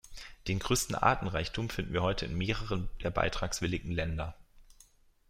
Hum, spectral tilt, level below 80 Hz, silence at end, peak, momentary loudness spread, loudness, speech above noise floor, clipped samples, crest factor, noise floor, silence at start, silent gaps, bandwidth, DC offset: none; -4.5 dB/octave; -44 dBFS; 0.65 s; -10 dBFS; 9 LU; -33 LUFS; 30 dB; under 0.1%; 24 dB; -62 dBFS; 0.05 s; none; 16 kHz; under 0.1%